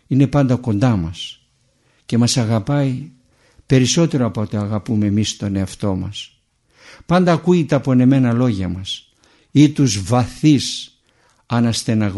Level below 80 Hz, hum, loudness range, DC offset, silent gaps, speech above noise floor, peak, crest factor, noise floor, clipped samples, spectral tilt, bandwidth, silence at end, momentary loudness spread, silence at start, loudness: -46 dBFS; none; 4 LU; under 0.1%; none; 44 dB; 0 dBFS; 18 dB; -60 dBFS; under 0.1%; -6 dB/octave; 11.5 kHz; 0 s; 13 LU; 0.1 s; -17 LUFS